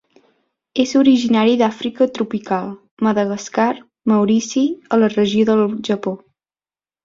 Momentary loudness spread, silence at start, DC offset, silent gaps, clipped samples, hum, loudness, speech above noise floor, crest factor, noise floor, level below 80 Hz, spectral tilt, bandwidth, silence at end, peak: 9 LU; 0.75 s; under 0.1%; 2.91-2.97 s; under 0.1%; none; -17 LUFS; over 74 dB; 16 dB; under -90 dBFS; -60 dBFS; -5.5 dB/octave; 7.6 kHz; 0.9 s; -2 dBFS